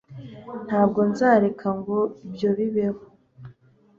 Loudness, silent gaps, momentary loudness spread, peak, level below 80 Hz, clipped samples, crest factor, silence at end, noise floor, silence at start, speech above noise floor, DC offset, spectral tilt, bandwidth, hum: -23 LUFS; none; 19 LU; -6 dBFS; -60 dBFS; under 0.1%; 18 dB; 0.5 s; -54 dBFS; 0.1 s; 32 dB; under 0.1%; -8 dB/octave; 7.4 kHz; none